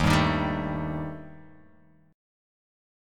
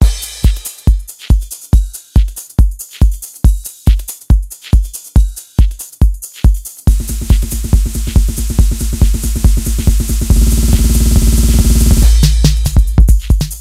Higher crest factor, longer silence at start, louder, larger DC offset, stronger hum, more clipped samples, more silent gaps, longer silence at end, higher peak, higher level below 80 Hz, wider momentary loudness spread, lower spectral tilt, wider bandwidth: first, 22 dB vs 10 dB; about the same, 0 s vs 0 s; second, -28 LUFS vs -14 LUFS; neither; neither; second, under 0.1% vs 0.9%; neither; first, 0.95 s vs 0 s; second, -6 dBFS vs 0 dBFS; second, -42 dBFS vs -12 dBFS; first, 20 LU vs 5 LU; about the same, -6 dB/octave vs -5.5 dB/octave; about the same, 16 kHz vs 16 kHz